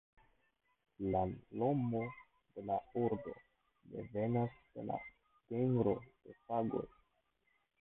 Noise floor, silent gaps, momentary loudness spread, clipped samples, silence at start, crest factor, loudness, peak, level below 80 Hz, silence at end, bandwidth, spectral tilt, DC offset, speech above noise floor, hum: -80 dBFS; none; 18 LU; under 0.1%; 1 s; 20 dB; -39 LUFS; -20 dBFS; -66 dBFS; 0.95 s; 3.9 kHz; -6.5 dB/octave; under 0.1%; 42 dB; none